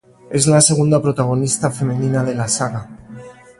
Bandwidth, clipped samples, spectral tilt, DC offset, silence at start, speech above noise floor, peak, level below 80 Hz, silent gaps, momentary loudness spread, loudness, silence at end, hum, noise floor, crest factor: 11.5 kHz; under 0.1%; -5 dB/octave; under 0.1%; 0.3 s; 21 dB; 0 dBFS; -50 dBFS; none; 13 LU; -16 LUFS; 0.3 s; none; -37 dBFS; 18 dB